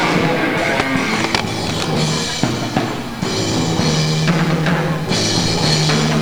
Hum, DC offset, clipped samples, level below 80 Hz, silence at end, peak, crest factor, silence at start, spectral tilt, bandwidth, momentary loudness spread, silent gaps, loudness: none; 1%; under 0.1%; -40 dBFS; 0 s; 0 dBFS; 16 dB; 0 s; -4.5 dB/octave; over 20 kHz; 5 LU; none; -17 LUFS